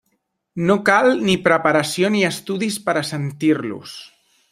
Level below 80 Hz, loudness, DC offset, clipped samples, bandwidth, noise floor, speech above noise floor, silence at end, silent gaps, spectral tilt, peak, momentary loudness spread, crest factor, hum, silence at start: -58 dBFS; -18 LUFS; under 0.1%; under 0.1%; 16 kHz; -70 dBFS; 52 dB; 0.45 s; none; -5 dB/octave; -2 dBFS; 15 LU; 18 dB; none; 0.55 s